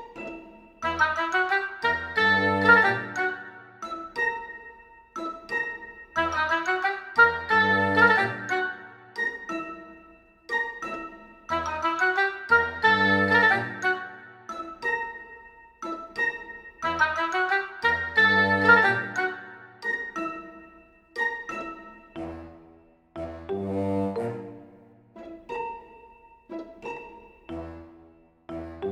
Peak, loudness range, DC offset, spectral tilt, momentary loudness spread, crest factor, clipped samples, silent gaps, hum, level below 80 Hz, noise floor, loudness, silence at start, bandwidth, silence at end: -4 dBFS; 13 LU; under 0.1%; -5 dB/octave; 22 LU; 22 dB; under 0.1%; none; none; -60 dBFS; -56 dBFS; -24 LUFS; 0 s; 13.5 kHz; 0 s